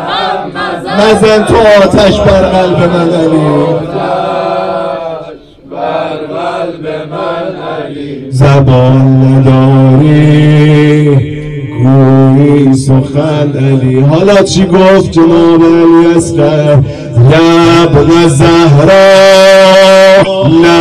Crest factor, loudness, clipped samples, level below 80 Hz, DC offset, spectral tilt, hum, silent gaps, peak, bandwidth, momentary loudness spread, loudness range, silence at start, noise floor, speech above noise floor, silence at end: 6 dB; -6 LUFS; under 0.1%; -30 dBFS; 0.6%; -6.5 dB/octave; none; none; 0 dBFS; 12.5 kHz; 13 LU; 10 LU; 0 s; -28 dBFS; 24 dB; 0 s